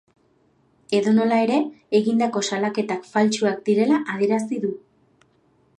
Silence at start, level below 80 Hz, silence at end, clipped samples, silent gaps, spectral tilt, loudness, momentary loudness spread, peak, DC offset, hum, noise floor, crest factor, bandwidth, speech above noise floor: 0.9 s; -72 dBFS; 1 s; under 0.1%; none; -5 dB/octave; -21 LUFS; 8 LU; -6 dBFS; under 0.1%; none; -62 dBFS; 16 dB; 10.5 kHz; 41 dB